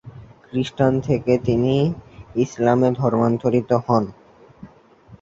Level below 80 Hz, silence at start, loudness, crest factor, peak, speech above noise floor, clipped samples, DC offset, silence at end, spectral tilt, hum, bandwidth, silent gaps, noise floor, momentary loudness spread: -48 dBFS; 0.05 s; -20 LUFS; 18 dB; -2 dBFS; 29 dB; under 0.1%; under 0.1%; 0.05 s; -8 dB/octave; none; 7.8 kHz; none; -48 dBFS; 8 LU